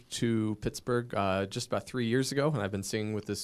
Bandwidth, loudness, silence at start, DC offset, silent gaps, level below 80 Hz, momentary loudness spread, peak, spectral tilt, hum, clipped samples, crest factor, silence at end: 15.5 kHz; -32 LUFS; 0.1 s; under 0.1%; none; -58 dBFS; 5 LU; -16 dBFS; -5 dB/octave; none; under 0.1%; 16 dB; 0 s